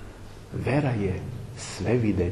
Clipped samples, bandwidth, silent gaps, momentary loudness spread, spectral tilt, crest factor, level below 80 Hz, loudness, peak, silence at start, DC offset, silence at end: under 0.1%; 12 kHz; none; 14 LU; -7 dB/octave; 16 dB; -46 dBFS; -28 LUFS; -10 dBFS; 0 s; under 0.1%; 0 s